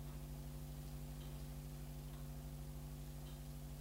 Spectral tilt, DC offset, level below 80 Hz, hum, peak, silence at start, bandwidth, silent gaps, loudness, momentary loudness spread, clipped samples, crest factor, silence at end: -6 dB/octave; under 0.1%; -54 dBFS; none; -40 dBFS; 0 s; 16 kHz; none; -52 LUFS; 1 LU; under 0.1%; 10 dB; 0 s